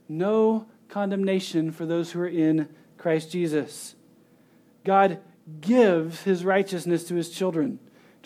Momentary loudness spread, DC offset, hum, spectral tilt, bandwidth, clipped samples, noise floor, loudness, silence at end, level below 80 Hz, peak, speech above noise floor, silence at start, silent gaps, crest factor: 13 LU; under 0.1%; none; -6 dB/octave; 16 kHz; under 0.1%; -58 dBFS; -25 LUFS; 0.5 s; -84 dBFS; -8 dBFS; 34 dB; 0.1 s; none; 18 dB